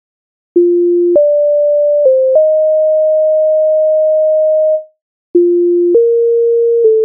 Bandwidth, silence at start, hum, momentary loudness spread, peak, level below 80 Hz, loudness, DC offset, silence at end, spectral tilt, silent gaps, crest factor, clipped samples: 1 kHz; 0.55 s; none; 3 LU; 0 dBFS; -66 dBFS; -10 LUFS; under 0.1%; 0 s; -8 dB/octave; 5.02-5.34 s; 10 dB; under 0.1%